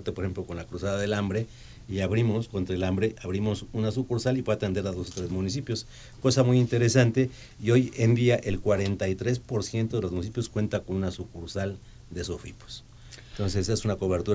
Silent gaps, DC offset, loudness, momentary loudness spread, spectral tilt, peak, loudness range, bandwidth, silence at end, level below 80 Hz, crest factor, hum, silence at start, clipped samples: none; under 0.1%; -28 LUFS; 14 LU; -6 dB/octave; -6 dBFS; 8 LU; 8 kHz; 0 s; -46 dBFS; 20 dB; none; 0 s; under 0.1%